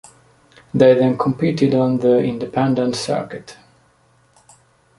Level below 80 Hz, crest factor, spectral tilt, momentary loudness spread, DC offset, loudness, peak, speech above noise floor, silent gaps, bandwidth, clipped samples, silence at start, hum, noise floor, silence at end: -56 dBFS; 18 dB; -7 dB/octave; 11 LU; under 0.1%; -17 LUFS; -2 dBFS; 40 dB; none; 11.5 kHz; under 0.1%; 0.75 s; none; -56 dBFS; 1.45 s